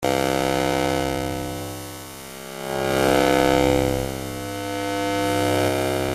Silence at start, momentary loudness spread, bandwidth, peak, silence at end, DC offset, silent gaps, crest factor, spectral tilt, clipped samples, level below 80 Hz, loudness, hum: 0 s; 15 LU; 16 kHz; -2 dBFS; 0 s; under 0.1%; none; 20 dB; -4.5 dB/octave; under 0.1%; -42 dBFS; -22 LUFS; none